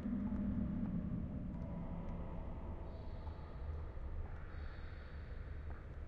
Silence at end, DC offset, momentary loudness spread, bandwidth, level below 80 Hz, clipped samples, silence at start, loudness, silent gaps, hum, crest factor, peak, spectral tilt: 0 s; under 0.1%; 10 LU; 5.2 kHz; -48 dBFS; under 0.1%; 0 s; -46 LUFS; none; none; 14 dB; -30 dBFS; -9 dB/octave